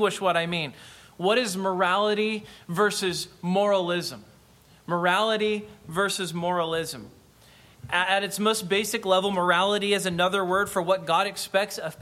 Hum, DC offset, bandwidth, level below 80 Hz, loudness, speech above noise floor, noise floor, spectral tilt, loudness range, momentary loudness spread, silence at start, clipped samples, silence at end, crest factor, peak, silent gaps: none; under 0.1%; 16 kHz; -62 dBFS; -25 LUFS; 30 dB; -55 dBFS; -3.5 dB/octave; 4 LU; 8 LU; 0 s; under 0.1%; 0 s; 18 dB; -8 dBFS; none